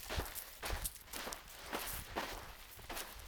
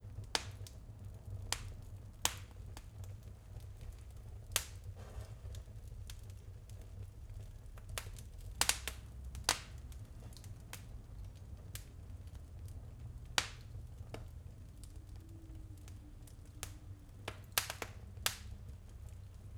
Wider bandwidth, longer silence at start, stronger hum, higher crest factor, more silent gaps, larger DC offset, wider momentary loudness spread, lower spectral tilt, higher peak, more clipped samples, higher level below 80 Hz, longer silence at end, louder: about the same, over 20 kHz vs over 20 kHz; about the same, 0 s vs 0 s; neither; second, 26 dB vs 38 dB; neither; neither; second, 7 LU vs 16 LU; about the same, -2.5 dB/octave vs -2 dB/octave; second, -20 dBFS vs -8 dBFS; neither; about the same, -52 dBFS vs -52 dBFS; about the same, 0 s vs 0 s; about the same, -44 LUFS vs -44 LUFS